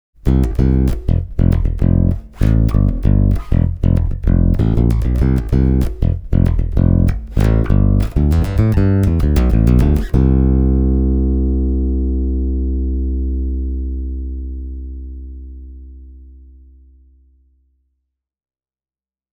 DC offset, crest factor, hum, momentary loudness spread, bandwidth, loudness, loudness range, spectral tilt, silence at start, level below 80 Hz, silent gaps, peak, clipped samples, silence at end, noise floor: under 0.1%; 14 dB; none; 11 LU; 6.6 kHz; -16 LUFS; 13 LU; -9.5 dB/octave; 0.25 s; -18 dBFS; none; -2 dBFS; under 0.1%; 3.05 s; under -90 dBFS